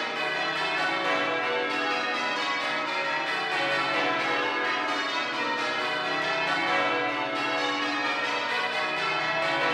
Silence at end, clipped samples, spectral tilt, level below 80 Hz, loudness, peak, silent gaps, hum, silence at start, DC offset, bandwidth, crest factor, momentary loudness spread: 0 s; under 0.1%; -2.5 dB/octave; -78 dBFS; -26 LUFS; -14 dBFS; none; none; 0 s; under 0.1%; 14 kHz; 14 dB; 2 LU